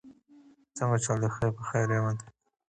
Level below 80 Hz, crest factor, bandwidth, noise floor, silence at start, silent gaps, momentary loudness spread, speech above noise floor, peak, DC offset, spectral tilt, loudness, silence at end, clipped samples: -60 dBFS; 16 dB; 9.4 kHz; -58 dBFS; 0.05 s; none; 7 LU; 30 dB; -14 dBFS; under 0.1%; -6 dB/octave; -30 LUFS; 0.5 s; under 0.1%